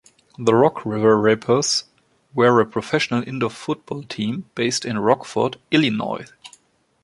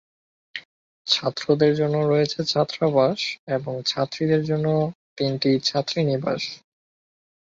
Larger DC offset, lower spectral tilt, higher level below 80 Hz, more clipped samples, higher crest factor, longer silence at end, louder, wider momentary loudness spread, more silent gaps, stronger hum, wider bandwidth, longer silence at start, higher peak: neither; about the same, -4.5 dB/octave vs -5.5 dB/octave; about the same, -60 dBFS vs -64 dBFS; neither; about the same, 18 dB vs 20 dB; second, 0.55 s vs 1 s; about the same, -20 LUFS vs -22 LUFS; about the same, 12 LU vs 11 LU; second, none vs 0.65-1.05 s, 3.39-3.47 s, 4.95-5.16 s; neither; first, 11.5 kHz vs 7.8 kHz; second, 0.4 s vs 0.55 s; about the same, -2 dBFS vs -4 dBFS